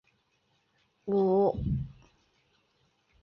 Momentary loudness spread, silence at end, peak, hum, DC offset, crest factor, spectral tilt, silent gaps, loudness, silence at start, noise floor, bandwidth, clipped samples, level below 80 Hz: 18 LU; 1.3 s; -16 dBFS; none; under 0.1%; 16 dB; -11 dB/octave; none; -28 LUFS; 1.05 s; -73 dBFS; 5.8 kHz; under 0.1%; -50 dBFS